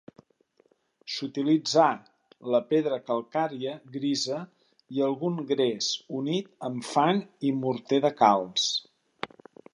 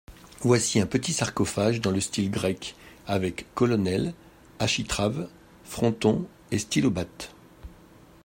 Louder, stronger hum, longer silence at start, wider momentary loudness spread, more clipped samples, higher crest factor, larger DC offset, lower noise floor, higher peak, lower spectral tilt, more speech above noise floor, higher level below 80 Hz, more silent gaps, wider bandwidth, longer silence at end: about the same, -27 LUFS vs -26 LUFS; neither; first, 1.05 s vs 0.1 s; about the same, 14 LU vs 12 LU; neither; about the same, 22 dB vs 20 dB; neither; first, -67 dBFS vs -52 dBFS; about the same, -6 dBFS vs -8 dBFS; about the same, -4.5 dB/octave vs -4.5 dB/octave; first, 40 dB vs 27 dB; second, -80 dBFS vs -52 dBFS; neither; second, 11 kHz vs 16.5 kHz; about the same, 0.45 s vs 0.5 s